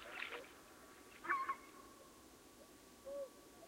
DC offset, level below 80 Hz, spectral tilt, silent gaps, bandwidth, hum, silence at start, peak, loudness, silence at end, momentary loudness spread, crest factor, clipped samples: under 0.1%; -78 dBFS; -2.5 dB/octave; none; 16 kHz; none; 0 s; -24 dBFS; -46 LUFS; 0 s; 20 LU; 26 dB; under 0.1%